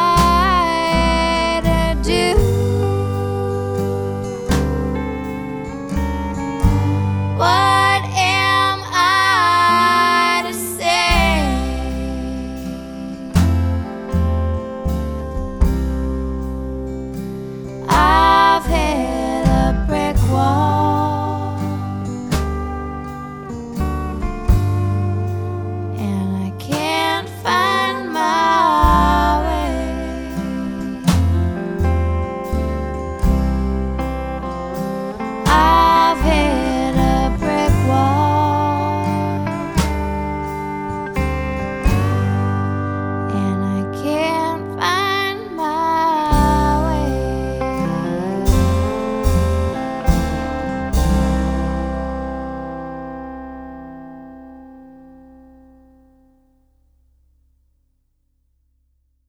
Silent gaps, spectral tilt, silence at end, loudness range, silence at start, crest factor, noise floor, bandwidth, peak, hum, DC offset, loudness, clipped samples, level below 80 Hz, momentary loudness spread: none; -5.5 dB/octave; 4.1 s; 7 LU; 0 s; 18 dB; -64 dBFS; over 20 kHz; 0 dBFS; none; under 0.1%; -18 LUFS; under 0.1%; -26 dBFS; 12 LU